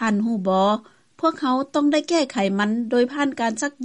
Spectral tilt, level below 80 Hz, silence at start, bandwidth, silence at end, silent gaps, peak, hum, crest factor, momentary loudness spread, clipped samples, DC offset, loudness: -5 dB/octave; -68 dBFS; 0 s; 11 kHz; 0 s; none; -8 dBFS; none; 14 dB; 4 LU; under 0.1%; under 0.1%; -21 LUFS